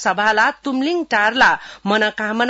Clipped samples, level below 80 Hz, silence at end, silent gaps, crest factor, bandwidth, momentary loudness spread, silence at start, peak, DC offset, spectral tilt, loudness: under 0.1%; -54 dBFS; 0 s; none; 14 dB; 8 kHz; 7 LU; 0 s; -2 dBFS; under 0.1%; -3.5 dB/octave; -17 LUFS